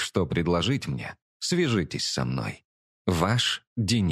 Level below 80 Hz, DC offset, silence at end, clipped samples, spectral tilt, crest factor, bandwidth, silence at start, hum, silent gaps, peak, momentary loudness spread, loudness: -50 dBFS; under 0.1%; 0 s; under 0.1%; -5 dB/octave; 20 dB; 14.5 kHz; 0 s; none; 1.22-1.40 s, 2.65-3.05 s, 3.67-3.76 s; -8 dBFS; 10 LU; -27 LUFS